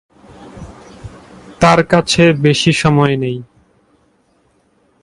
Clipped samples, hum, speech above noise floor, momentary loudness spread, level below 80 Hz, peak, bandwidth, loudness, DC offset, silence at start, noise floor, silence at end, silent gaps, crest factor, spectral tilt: under 0.1%; none; 45 dB; 25 LU; -42 dBFS; 0 dBFS; 11.5 kHz; -12 LUFS; under 0.1%; 0.4 s; -57 dBFS; 1.6 s; none; 16 dB; -5.5 dB/octave